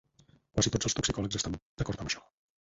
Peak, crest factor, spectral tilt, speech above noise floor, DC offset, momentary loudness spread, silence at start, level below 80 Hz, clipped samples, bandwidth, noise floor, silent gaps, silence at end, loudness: -12 dBFS; 22 dB; -3.5 dB/octave; 32 dB; under 0.1%; 9 LU; 0.55 s; -48 dBFS; under 0.1%; 8 kHz; -65 dBFS; 1.62-1.77 s; 0.4 s; -32 LUFS